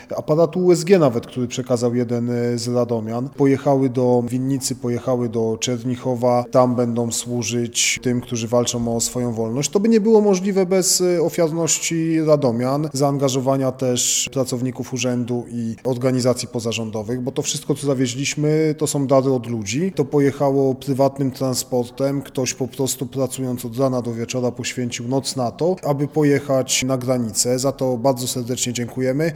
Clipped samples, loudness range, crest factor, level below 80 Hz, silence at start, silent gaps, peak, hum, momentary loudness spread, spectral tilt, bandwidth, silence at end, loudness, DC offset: under 0.1%; 5 LU; 18 dB; -54 dBFS; 0 s; none; -2 dBFS; none; 7 LU; -5 dB/octave; 17.5 kHz; 0 s; -20 LUFS; under 0.1%